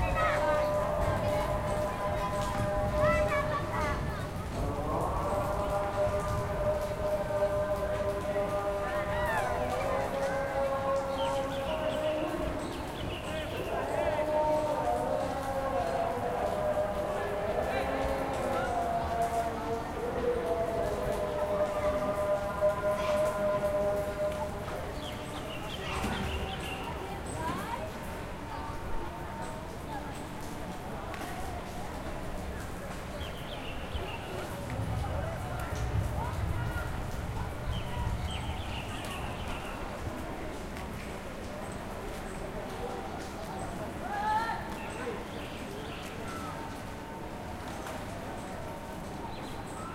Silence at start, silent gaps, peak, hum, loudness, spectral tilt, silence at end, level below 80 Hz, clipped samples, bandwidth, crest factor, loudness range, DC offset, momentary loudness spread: 0 s; none; -16 dBFS; none; -34 LUFS; -5.5 dB/octave; 0 s; -42 dBFS; under 0.1%; 16.5 kHz; 16 dB; 9 LU; under 0.1%; 10 LU